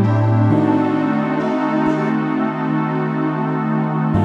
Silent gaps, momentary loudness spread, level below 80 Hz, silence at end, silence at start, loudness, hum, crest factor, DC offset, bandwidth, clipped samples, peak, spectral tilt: none; 5 LU; -48 dBFS; 0 s; 0 s; -18 LUFS; none; 14 dB; under 0.1%; 7 kHz; under 0.1%; -4 dBFS; -9.5 dB/octave